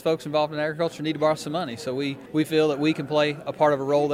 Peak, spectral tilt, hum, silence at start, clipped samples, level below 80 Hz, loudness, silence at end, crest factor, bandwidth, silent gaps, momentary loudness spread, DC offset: -8 dBFS; -6 dB/octave; none; 0 s; under 0.1%; -66 dBFS; -24 LUFS; 0 s; 16 dB; 15.5 kHz; none; 7 LU; under 0.1%